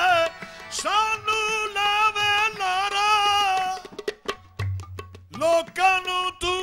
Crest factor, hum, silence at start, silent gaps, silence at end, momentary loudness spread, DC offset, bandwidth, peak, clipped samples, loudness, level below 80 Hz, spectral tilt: 14 dB; none; 0 s; none; 0 s; 14 LU; under 0.1%; 16 kHz; -10 dBFS; under 0.1%; -22 LUFS; -54 dBFS; -2.5 dB/octave